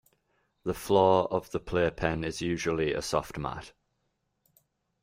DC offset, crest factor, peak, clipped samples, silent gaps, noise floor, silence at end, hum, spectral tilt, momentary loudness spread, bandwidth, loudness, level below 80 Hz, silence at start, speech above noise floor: under 0.1%; 22 dB; -8 dBFS; under 0.1%; none; -78 dBFS; 1.35 s; none; -5.5 dB/octave; 13 LU; 16 kHz; -29 LUFS; -52 dBFS; 0.65 s; 50 dB